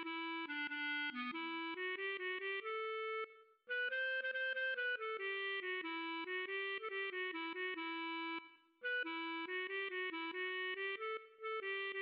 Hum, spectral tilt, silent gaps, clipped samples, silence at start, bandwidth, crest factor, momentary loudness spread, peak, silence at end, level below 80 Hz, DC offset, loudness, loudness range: none; 3 dB/octave; none; under 0.1%; 0 s; 5.6 kHz; 10 dB; 5 LU; -32 dBFS; 0 s; under -90 dBFS; under 0.1%; -41 LUFS; 2 LU